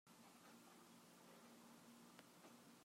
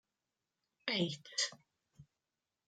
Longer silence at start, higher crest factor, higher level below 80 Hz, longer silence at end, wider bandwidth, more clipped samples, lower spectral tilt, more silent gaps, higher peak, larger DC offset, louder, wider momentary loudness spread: second, 0.05 s vs 0.85 s; about the same, 26 dB vs 24 dB; second, under -90 dBFS vs -84 dBFS; second, 0 s vs 0.65 s; first, 16 kHz vs 9.6 kHz; neither; about the same, -3.5 dB/octave vs -3 dB/octave; neither; second, -42 dBFS vs -18 dBFS; neither; second, -65 LUFS vs -38 LUFS; about the same, 1 LU vs 3 LU